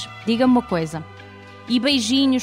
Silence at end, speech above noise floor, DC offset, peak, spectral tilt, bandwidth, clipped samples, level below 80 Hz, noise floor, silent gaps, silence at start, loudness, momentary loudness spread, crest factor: 0 s; 22 dB; under 0.1%; -6 dBFS; -4.5 dB/octave; 12 kHz; under 0.1%; -52 dBFS; -41 dBFS; none; 0 s; -19 LUFS; 23 LU; 14 dB